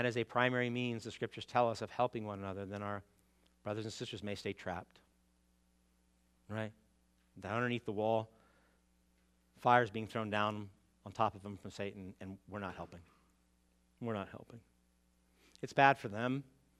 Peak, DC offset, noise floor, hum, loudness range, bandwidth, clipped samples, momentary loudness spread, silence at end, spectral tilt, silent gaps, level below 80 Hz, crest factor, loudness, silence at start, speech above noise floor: -12 dBFS; under 0.1%; -74 dBFS; none; 10 LU; 13 kHz; under 0.1%; 19 LU; 0.35 s; -6 dB/octave; none; -74 dBFS; 28 dB; -37 LUFS; 0 s; 36 dB